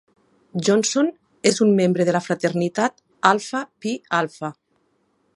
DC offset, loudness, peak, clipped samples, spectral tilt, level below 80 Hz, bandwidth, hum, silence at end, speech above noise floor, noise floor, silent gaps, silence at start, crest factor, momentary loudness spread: under 0.1%; -21 LUFS; 0 dBFS; under 0.1%; -4.5 dB/octave; -68 dBFS; 11.5 kHz; none; 0.85 s; 46 dB; -66 dBFS; none; 0.55 s; 20 dB; 11 LU